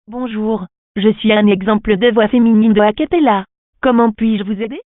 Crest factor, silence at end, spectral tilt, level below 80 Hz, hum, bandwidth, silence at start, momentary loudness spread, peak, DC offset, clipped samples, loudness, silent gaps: 14 dB; 0.1 s; -12 dB/octave; -42 dBFS; none; 3.9 kHz; 0.1 s; 9 LU; 0 dBFS; under 0.1%; under 0.1%; -14 LUFS; 0.78-0.95 s, 3.58-3.73 s